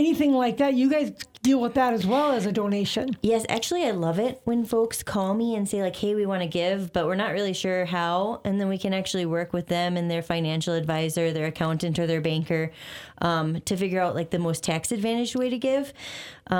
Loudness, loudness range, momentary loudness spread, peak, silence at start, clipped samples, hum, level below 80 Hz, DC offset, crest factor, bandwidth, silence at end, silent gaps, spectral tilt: -25 LUFS; 3 LU; 5 LU; -10 dBFS; 0 s; under 0.1%; none; -58 dBFS; under 0.1%; 16 dB; 19 kHz; 0 s; none; -5.5 dB/octave